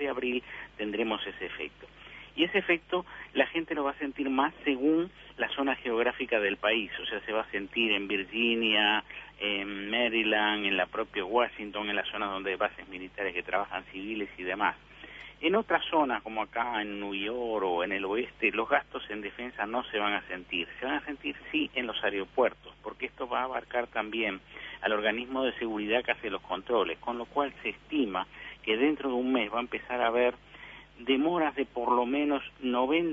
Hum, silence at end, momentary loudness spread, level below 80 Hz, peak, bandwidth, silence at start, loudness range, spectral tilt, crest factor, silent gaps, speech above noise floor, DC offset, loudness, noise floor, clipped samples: none; 0 s; 11 LU; -60 dBFS; -10 dBFS; 7.2 kHz; 0 s; 4 LU; -6 dB/octave; 20 dB; none; 19 dB; under 0.1%; -30 LUFS; -50 dBFS; under 0.1%